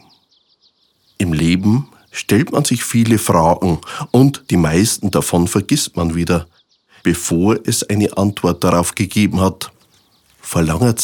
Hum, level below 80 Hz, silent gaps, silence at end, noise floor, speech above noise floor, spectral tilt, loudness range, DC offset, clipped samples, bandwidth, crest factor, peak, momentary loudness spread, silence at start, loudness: none; -38 dBFS; none; 0 s; -59 dBFS; 44 dB; -5 dB/octave; 3 LU; under 0.1%; under 0.1%; 18 kHz; 16 dB; 0 dBFS; 7 LU; 1.2 s; -16 LUFS